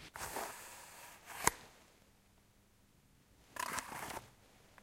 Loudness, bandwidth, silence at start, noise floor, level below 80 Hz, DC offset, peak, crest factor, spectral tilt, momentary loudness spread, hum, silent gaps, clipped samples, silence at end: -42 LUFS; 16 kHz; 0 s; -69 dBFS; -66 dBFS; under 0.1%; -10 dBFS; 36 dB; -1.5 dB/octave; 26 LU; none; none; under 0.1%; 0 s